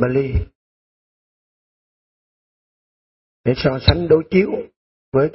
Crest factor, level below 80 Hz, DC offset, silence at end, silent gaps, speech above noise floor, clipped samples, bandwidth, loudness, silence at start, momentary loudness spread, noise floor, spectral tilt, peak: 20 dB; -34 dBFS; under 0.1%; 0.05 s; 0.55-3.44 s, 4.77-5.12 s; over 73 dB; under 0.1%; 5.8 kHz; -18 LUFS; 0 s; 13 LU; under -90 dBFS; -10.5 dB/octave; 0 dBFS